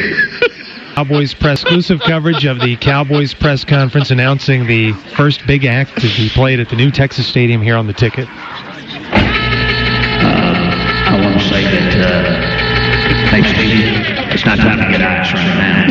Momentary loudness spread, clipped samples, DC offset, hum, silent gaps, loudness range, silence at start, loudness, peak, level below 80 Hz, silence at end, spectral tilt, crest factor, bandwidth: 5 LU; under 0.1%; under 0.1%; none; none; 2 LU; 0 s; -12 LUFS; 0 dBFS; -28 dBFS; 0 s; -7 dB/octave; 12 dB; 7.4 kHz